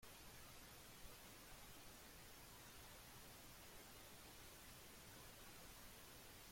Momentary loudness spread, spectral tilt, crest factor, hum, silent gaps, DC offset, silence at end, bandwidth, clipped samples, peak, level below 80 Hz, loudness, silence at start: 1 LU; -2.5 dB/octave; 16 dB; none; none; under 0.1%; 0 s; 16.5 kHz; under 0.1%; -46 dBFS; -70 dBFS; -60 LUFS; 0 s